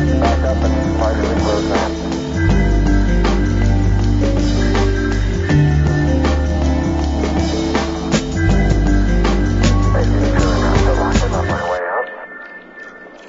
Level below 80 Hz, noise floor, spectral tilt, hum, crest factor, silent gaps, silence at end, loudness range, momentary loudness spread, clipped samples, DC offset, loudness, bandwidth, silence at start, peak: -18 dBFS; -35 dBFS; -6.5 dB/octave; none; 14 dB; none; 0 s; 1 LU; 5 LU; under 0.1%; under 0.1%; -16 LUFS; 7.8 kHz; 0 s; 0 dBFS